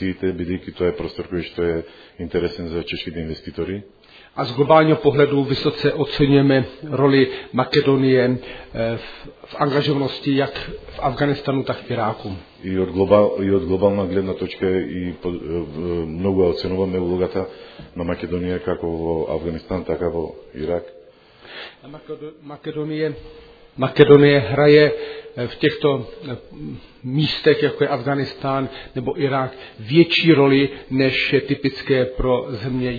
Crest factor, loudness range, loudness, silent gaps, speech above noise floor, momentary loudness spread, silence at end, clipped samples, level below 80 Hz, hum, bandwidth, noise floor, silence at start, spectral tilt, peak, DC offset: 20 dB; 10 LU; -19 LUFS; none; 27 dB; 18 LU; 0 s; under 0.1%; -44 dBFS; none; 5 kHz; -47 dBFS; 0 s; -8.5 dB/octave; 0 dBFS; under 0.1%